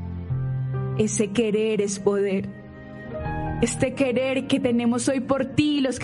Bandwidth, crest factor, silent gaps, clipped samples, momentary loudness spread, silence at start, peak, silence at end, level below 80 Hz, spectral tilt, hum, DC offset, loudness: 11.5 kHz; 18 dB; none; under 0.1%; 10 LU; 0 s; -6 dBFS; 0 s; -44 dBFS; -5.5 dB/octave; none; under 0.1%; -24 LUFS